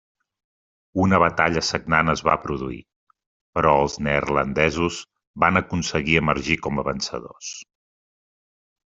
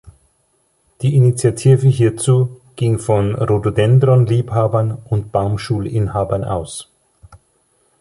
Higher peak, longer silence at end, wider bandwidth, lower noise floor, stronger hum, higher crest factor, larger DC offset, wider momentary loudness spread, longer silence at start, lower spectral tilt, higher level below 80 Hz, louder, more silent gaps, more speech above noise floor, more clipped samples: about the same, -2 dBFS vs -2 dBFS; first, 1.35 s vs 1.15 s; second, 7.8 kHz vs 11.5 kHz; first, under -90 dBFS vs -62 dBFS; neither; first, 22 dB vs 14 dB; neither; first, 15 LU vs 9 LU; first, 0.95 s vs 0.05 s; second, -5 dB/octave vs -7.5 dB/octave; about the same, -46 dBFS vs -42 dBFS; second, -21 LUFS vs -16 LUFS; first, 2.96-3.07 s, 3.26-3.53 s, 5.27-5.34 s vs none; first, over 69 dB vs 47 dB; neither